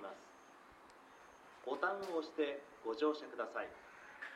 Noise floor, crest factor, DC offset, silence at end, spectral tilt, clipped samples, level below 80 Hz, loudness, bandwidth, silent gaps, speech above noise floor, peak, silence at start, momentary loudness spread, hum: -61 dBFS; 20 dB; under 0.1%; 0 s; -4 dB/octave; under 0.1%; -82 dBFS; -42 LUFS; 13 kHz; none; 21 dB; -22 dBFS; 0 s; 22 LU; none